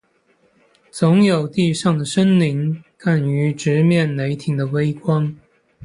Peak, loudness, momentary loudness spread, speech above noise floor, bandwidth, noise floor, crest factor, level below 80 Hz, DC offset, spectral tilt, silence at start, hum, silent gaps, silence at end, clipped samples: -2 dBFS; -18 LUFS; 8 LU; 43 dB; 11 kHz; -60 dBFS; 16 dB; -58 dBFS; under 0.1%; -7 dB/octave; 0.95 s; none; none; 0 s; under 0.1%